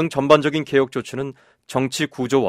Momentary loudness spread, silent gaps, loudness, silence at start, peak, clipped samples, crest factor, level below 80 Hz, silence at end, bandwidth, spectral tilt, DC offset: 13 LU; none; -20 LUFS; 0 s; 0 dBFS; under 0.1%; 20 dB; -58 dBFS; 0 s; 15.5 kHz; -5 dB/octave; under 0.1%